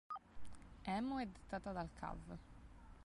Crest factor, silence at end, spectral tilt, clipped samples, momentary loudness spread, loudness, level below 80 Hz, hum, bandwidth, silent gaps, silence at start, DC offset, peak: 18 dB; 0 s; -6.5 dB/octave; under 0.1%; 20 LU; -47 LUFS; -60 dBFS; none; 11.5 kHz; none; 0.1 s; under 0.1%; -30 dBFS